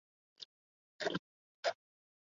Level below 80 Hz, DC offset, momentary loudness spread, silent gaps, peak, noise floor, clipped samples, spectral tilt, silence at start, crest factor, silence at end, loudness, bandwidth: -82 dBFS; under 0.1%; 14 LU; 0.45-0.99 s, 1.19-1.63 s; -22 dBFS; under -90 dBFS; under 0.1%; -2 dB/octave; 0.4 s; 24 dB; 0.6 s; -41 LUFS; 7.4 kHz